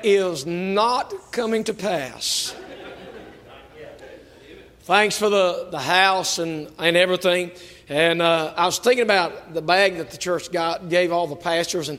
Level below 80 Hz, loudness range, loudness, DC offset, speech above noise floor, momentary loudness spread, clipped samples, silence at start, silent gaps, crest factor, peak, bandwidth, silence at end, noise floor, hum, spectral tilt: -60 dBFS; 7 LU; -21 LUFS; under 0.1%; 24 dB; 11 LU; under 0.1%; 0 s; none; 20 dB; -2 dBFS; 16 kHz; 0 s; -45 dBFS; none; -3 dB/octave